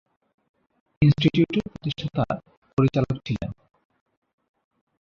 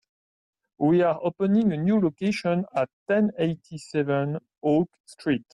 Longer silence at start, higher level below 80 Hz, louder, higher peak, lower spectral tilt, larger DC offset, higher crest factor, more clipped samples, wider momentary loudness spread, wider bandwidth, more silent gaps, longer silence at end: first, 1 s vs 0.8 s; first, -48 dBFS vs -64 dBFS; about the same, -24 LUFS vs -25 LUFS; first, -6 dBFS vs -12 dBFS; about the same, -8 dB/octave vs -7.5 dB/octave; neither; first, 20 dB vs 14 dB; neither; first, 11 LU vs 8 LU; second, 7 kHz vs 11 kHz; second, 2.57-2.62 s vs 2.93-3.06 s, 5.00-5.04 s; first, 1.5 s vs 0.1 s